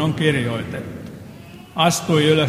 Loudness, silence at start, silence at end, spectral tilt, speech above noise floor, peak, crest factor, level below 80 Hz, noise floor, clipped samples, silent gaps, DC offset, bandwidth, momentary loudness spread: -20 LUFS; 0 s; 0 s; -5 dB/octave; 21 dB; 0 dBFS; 20 dB; -50 dBFS; -39 dBFS; under 0.1%; none; under 0.1%; 16 kHz; 22 LU